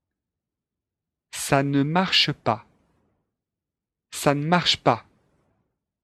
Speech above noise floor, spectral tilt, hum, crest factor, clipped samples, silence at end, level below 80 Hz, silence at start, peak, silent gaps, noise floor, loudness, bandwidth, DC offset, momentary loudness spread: 66 dB; -4.5 dB/octave; none; 24 dB; under 0.1%; 1.05 s; -58 dBFS; 1.35 s; -2 dBFS; none; -87 dBFS; -22 LUFS; 13 kHz; under 0.1%; 12 LU